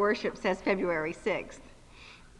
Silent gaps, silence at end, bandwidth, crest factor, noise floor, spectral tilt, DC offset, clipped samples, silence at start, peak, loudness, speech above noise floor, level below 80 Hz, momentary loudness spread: none; 0.2 s; 11 kHz; 18 dB; -52 dBFS; -5.5 dB/octave; under 0.1%; under 0.1%; 0 s; -14 dBFS; -31 LUFS; 21 dB; -56 dBFS; 22 LU